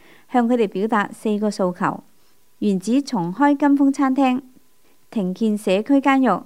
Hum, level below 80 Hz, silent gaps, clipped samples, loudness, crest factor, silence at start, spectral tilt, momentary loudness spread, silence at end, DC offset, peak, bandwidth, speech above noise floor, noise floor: none; -72 dBFS; none; under 0.1%; -20 LUFS; 16 dB; 0.3 s; -6.5 dB/octave; 9 LU; 0 s; 0.3%; -4 dBFS; 12.5 kHz; 42 dB; -60 dBFS